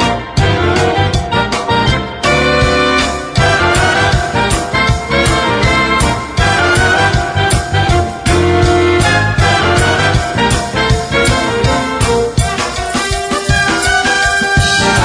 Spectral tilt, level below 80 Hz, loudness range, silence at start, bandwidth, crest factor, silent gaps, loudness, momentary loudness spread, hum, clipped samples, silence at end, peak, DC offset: -4.5 dB/octave; -22 dBFS; 2 LU; 0 s; 11 kHz; 12 dB; none; -12 LUFS; 4 LU; none; under 0.1%; 0 s; 0 dBFS; under 0.1%